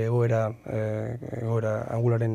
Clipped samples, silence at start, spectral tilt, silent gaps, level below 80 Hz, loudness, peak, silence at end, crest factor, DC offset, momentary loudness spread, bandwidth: under 0.1%; 0 s; -9 dB/octave; none; -60 dBFS; -28 LUFS; -14 dBFS; 0 s; 12 dB; under 0.1%; 8 LU; 7.4 kHz